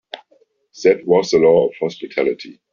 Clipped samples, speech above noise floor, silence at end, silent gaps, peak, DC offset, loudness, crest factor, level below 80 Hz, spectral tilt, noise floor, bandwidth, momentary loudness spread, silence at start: under 0.1%; 42 dB; 0.2 s; none; -2 dBFS; under 0.1%; -16 LUFS; 16 dB; -56 dBFS; -4.5 dB/octave; -58 dBFS; 7.2 kHz; 17 LU; 0.15 s